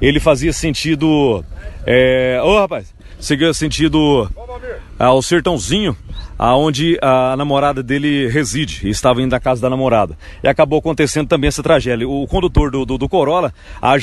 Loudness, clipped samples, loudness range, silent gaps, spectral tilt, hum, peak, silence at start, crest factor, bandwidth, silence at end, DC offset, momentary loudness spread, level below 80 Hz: -15 LUFS; under 0.1%; 1 LU; none; -5 dB/octave; none; 0 dBFS; 0 s; 14 dB; 12.5 kHz; 0 s; under 0.1%; 9 LU; -28 dBFS